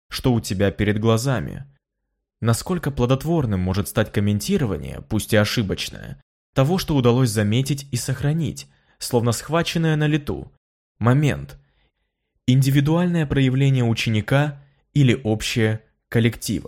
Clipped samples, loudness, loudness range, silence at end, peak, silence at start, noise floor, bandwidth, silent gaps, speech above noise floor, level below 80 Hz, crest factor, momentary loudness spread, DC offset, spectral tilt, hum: under 0.1%; -21 LUFS; 3 LU; 0.05 s; -4 dBFS; 0.1 s; -78 dBFS; 16.5 kHz; 6.22-6.53 s, 10.57-10.95 s; 58 dB; -42 dBFS; 16 dB; 9 LU; under 0.1%; -6 dB/octave; none